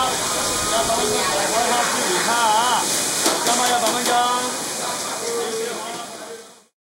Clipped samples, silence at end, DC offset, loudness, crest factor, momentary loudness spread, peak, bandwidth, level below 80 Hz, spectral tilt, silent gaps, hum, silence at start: under 0.1%; 0.3 s; under 0.1%; -19 LUFS; 18 dB; 11 LU; -4 dBFS; 16 kHz; -52 dBFS; -1 dB/octave; none; none; 0 s